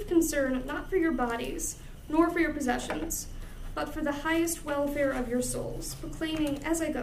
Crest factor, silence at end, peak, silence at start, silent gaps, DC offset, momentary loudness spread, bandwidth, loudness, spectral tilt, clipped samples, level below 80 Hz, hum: 18 dB; 0 s; -12 dBFS; 0 s; none; under 0.1%; 10 LU; 15.5 kHz; -30 LUFS; -4 dB/octave; under 0.1%; -42 dBFS; none